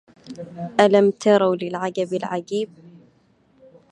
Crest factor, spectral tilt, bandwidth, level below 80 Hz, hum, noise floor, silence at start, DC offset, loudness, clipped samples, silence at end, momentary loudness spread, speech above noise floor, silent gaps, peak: 20 dB; -6 dB/octave; 10 kHz; -68 dBFS; none; -59 dBFS; 0.25 s; under 0.1%; -20 LUFS; under 0.1%; 1 s; 19 LU; 39 dB; none; -2 dBFS